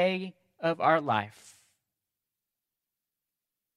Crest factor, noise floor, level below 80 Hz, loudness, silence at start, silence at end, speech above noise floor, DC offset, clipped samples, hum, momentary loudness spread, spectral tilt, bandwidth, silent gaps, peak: 22 dB; -89 dBFS; -84 dBFS; -28 LUFS; 0 s; 2.45 s; 60 dB; under 0.1%; under 0.1%; none; 16 LU; -6 dB/octave; 13 kHz; none; -10 dBFS